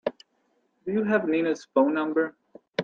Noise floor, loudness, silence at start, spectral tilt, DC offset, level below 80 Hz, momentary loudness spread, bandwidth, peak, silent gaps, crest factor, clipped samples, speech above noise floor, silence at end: -71 dBFS; -26 LUFS; 0.05 s; -6.5 dB/octave; under 0.1%; -72 dBFS; 11 LU; 7.6 kHz; -10 dBFS; none; 18 dB; under 0.1%; 46 dB; 0 s